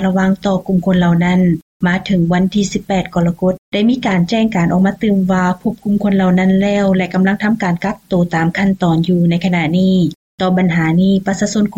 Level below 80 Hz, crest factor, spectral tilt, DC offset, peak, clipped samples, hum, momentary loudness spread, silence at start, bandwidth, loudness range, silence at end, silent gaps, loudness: -42 dBFS; 8 dB; -7 dB/octave; under 0.1%; -4 dBFS; under 0.1%; none; 5 LU; 0 s; 8.2 kHz; 1 LU; 0 s; 1.62-1.80 s, 3.58-3.72 s, 10.15-10.38 s; -14 LUFS